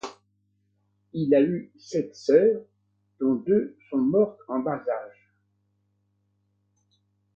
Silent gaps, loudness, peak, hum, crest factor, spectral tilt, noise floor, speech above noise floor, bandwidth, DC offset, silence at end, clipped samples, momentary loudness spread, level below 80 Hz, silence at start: none; -25 LUFS; -6 dBFS; 50 Hz at -55 dBFS; 20 dB; -7.5 dB/octave; -72 dBFS; 48 dB; 7.4 kHz; under 0.1%; 2.3 s; under 0.1%; 13 LU; -70 dBFS; 0.05 s